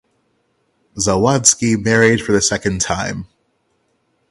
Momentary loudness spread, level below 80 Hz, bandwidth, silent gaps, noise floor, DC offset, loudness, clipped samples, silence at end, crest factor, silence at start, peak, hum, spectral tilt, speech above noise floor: 11 LU; -42 dBFS; 13 kHz; none; -65 dBFS; under 0.1%; -15 LUFS; under 0.1%; 1.05 s; 18 dB; 0.95 s; 0 dBFS; none; -3.5 dB/octave; 49 dB